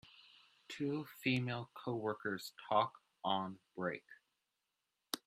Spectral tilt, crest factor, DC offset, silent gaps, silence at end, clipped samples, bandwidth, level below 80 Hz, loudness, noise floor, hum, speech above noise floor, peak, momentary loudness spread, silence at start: -5 dB/octave; 26 dB; under 0.1%; none; 0.1 s; under 0.1%; 15 kHz; -82 dBFS; -40 LUFS; -88 dBFS; none; 48 dB; -16 dBFS; 10 LU; 0.05 s